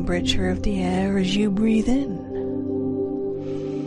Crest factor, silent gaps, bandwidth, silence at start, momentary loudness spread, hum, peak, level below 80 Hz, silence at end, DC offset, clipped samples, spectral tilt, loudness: 14 dB; none; 11 kHz; 0 s; 8 LU; none; -8 dBFS; -36 dBFS; 0 s; under 0.1%; under 0.1%; -6 dB/octave; -23 LUFS